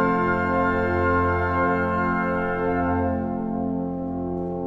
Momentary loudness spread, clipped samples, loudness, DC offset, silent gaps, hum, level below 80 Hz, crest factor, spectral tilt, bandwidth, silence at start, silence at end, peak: 7 LU; under 0.1%; -23 LUFS; under 0.1%; none; none; -42 dBFS; 12 dB; -9.5 dB/octave; 7.4 kHz; 0 s; 0 s; -10 dBFS